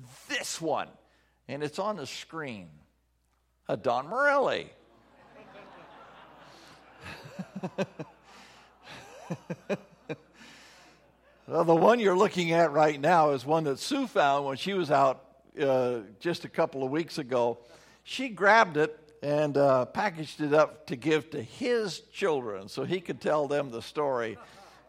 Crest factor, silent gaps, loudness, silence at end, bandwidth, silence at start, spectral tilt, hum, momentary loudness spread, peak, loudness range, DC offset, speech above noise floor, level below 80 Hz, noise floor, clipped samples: 20 dB; none; -28 LUFS; 0.3 s; 15.5 kHz; 0 s; -5 dB/octave; none; 19 LU; -8 dBFS; 17 LU; under 0.1%; 44 dB; -72 dBFS; -72 dBFS; under 0.1%